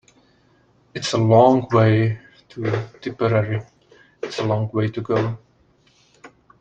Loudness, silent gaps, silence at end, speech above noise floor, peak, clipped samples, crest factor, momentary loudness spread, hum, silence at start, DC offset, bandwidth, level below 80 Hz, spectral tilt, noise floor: -20 LUFS; none; 0.35 s; 40 dB; -2 dBFS; under 0.1%; 18 dB; 19 LU; none; 0.95 s; under 0.1%; 8.2 kHz; -58 dBFS; -7 dB/octave; -58 dBFS